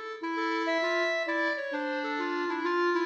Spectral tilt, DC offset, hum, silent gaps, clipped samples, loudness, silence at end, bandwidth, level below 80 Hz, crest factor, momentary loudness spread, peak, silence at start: -2 dB/octave; under 0.1%; none; none; under 0.1%; -29 LUFS; 0 s; 8 kHz; -82 dBFS; 12 dB; 5 LU; -18 dBFS; 0 s